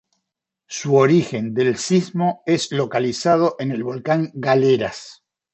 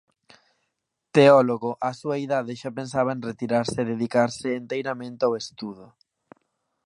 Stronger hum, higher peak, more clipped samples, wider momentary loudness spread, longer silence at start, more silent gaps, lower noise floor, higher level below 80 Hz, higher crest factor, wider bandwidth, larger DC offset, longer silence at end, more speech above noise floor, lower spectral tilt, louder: neither; about the same, -2 dBFS vs -4 dBFS; neither; second, 9 LU vs 15 LU; second, 0.7 s vs 1.15 s; neither; about the same, -81 dBFS vs -79 dBFS; about the same, -62 dBFS vs -66 dBFS; about the same, 18 dB vs 22 dB; second, 8.4 kHz vs 11 kHz; neither; second, 0.4 s vs 1 s; first, 62 dB vs 56 dB; about the same, -5.5 dB/octave vs -6 dB/octave; first, -19 LUFS vs -24 LUFS